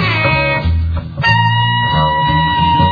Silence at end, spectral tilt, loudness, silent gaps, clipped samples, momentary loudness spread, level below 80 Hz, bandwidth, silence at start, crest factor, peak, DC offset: 0 s; -7 dB/octave; -13 LUFS; none; under 0.1%; 5 LU; -26 dBFS; 5 kHz; 0 s; 12 dB; 0 dBFS; under 0.1%